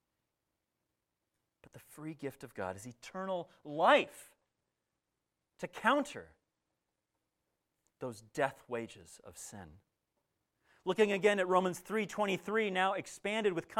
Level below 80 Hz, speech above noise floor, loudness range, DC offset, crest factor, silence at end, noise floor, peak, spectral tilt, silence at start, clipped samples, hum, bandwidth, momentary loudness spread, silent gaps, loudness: -76 dBFS; 53 dB; 11 LU; under 0.1%; 24 dB; 0 s; -87 dBFS; -14 dBFS; -4.5 dB/octave; 1.75 s; under 0.1%; none; 16 kHz; 19 LU; none; -34 LUFS